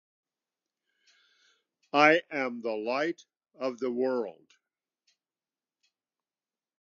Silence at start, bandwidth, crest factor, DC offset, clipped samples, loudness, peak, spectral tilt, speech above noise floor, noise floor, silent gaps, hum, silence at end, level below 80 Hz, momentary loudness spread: 1.95 s; 7.4 kHz; 26 dB; under 0.1%; under 0.1%; -28 LUFS; -8 dBFS; -4.5 dB/octave; over 62 dB; under -90 dBFS; none; none; 2.5 s; under -90 dBFS; 14 LU